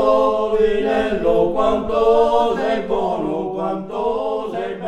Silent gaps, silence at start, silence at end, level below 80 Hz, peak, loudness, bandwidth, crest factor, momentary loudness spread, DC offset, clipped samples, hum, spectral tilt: none; 0 s; 0 s; -40 dBFS; -4 dBFS; -18 LUFS; 9.2 kHz; 14 dB; 8 LU; under 0.1%; under 0.1%; none; -6.5 dB/octave